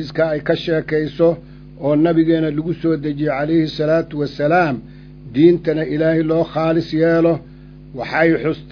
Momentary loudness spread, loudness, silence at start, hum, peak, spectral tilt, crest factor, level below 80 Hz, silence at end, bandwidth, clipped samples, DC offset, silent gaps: 8 LU; -17 LUFS; 0 s; none; 0 dBFS; -8.5 dB/octave; 16 dB; -44 dBFS; 0 s; 5.4 kHz; under 0.1%; under 0.1%; none